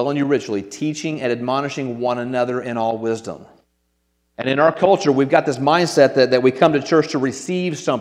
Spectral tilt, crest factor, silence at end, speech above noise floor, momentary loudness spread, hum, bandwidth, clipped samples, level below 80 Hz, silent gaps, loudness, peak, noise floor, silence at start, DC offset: -5.5 dB/octave; 18 dB; 0 s; 50 dB; 10 LU; none; 13 kHz; under 0.1%; -64 dBFS; none; -18 LUFS; 0 dBFS; -68 dBFS; 0 s; under 0.1%